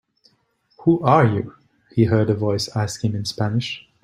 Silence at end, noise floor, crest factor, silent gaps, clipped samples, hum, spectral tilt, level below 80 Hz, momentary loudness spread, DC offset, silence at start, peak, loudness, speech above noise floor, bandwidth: 0.25 s; -64 dBFS; 18 dB; none; under 0.1%; none; -6.5 dB/octave; -54 dBFS; 11 LU; under 0.1%; 0.8 s; -2 dBFS; -20 LUFS; 45 dB; 12.5 kHz